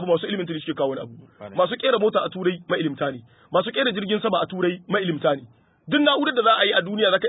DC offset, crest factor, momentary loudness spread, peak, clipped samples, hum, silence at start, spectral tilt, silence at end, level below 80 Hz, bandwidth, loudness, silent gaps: under 0.1%; 18 dB; 10 LU; -4 dBFS; under 0.1%; none; 0 s; -10 dB/octave; 0 s; -68 dBFS; 4 kHz; -22 LUFS; none